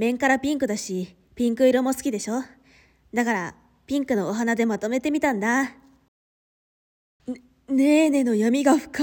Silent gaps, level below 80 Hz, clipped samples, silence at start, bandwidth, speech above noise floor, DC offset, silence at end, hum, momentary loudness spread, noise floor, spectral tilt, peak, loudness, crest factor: 6.08-7.20 s; -60 dBFS; under 0.1%; 0 s; 18.5 kHz; 35 dB; under 0.1%; 0 s; none; 17 LU; -57 dBFS; -4.5 dB/octave; -6 dBFS; -23 LUFS; 18 dB